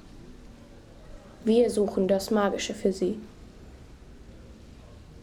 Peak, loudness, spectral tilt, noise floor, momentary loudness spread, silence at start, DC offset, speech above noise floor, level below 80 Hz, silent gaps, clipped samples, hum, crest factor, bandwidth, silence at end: -10 dBFS; -26 LUFS; -5.5 dB/octave; -49 dBFS; 26 LU; 0.05 s; under 0.1%; 24 dB; -50 dBFS; none; under 0.1%; none; 18 dB; 16.5 kHz; 0 s